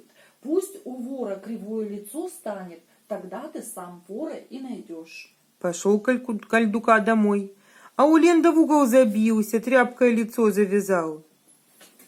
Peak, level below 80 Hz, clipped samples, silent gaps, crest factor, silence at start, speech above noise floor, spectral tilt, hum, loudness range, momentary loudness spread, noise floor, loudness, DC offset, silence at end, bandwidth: -2 dBFS; -74 dBFS; under 0.1%; none; 20 dB; 0.45 s; 37 dB; -5.5 dB/octave; none; 15 LU; 19 LU; -59 dBFS; -22 LUFS; under 0.1%; 0.85 s; 16.5 kHz